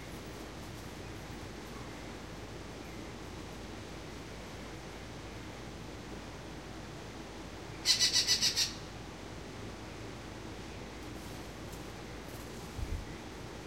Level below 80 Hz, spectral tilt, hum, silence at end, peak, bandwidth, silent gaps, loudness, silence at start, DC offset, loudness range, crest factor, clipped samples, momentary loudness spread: -52 dBFS; -2 dB/octave; none; 0 s; -12 dBFS; 16 kHz; none; -38 LUFS; 0 s; under 0.1%; 14 LU; 28 dB; under 0.1%; 17 LU